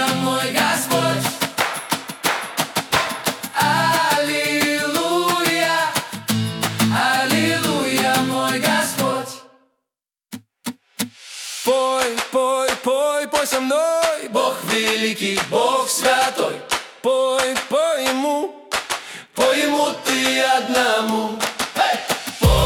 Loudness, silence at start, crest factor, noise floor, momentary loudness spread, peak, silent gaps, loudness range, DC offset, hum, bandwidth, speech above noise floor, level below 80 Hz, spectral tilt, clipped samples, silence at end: -19 LUFS; 0 s; 18 dB; -84 dBFS; 8 LU; -2 dBFS; none; 4 LU; under 0.1%; none; 18 kHz; 65 dB; -38 dBFS; -3 dB/octave; under 0.1%; 0 s